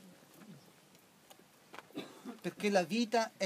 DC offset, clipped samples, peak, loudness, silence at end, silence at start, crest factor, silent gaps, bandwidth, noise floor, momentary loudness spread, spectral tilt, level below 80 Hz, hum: under 0.1%; under 0.1%; -16 dBFS; -36 LUFS; 0 s; 0.05 s; 22 dB; none; 15.5 kHz; -63 dBFS; 25 LU; -4.5 dB/octave; under -90 dBFS; none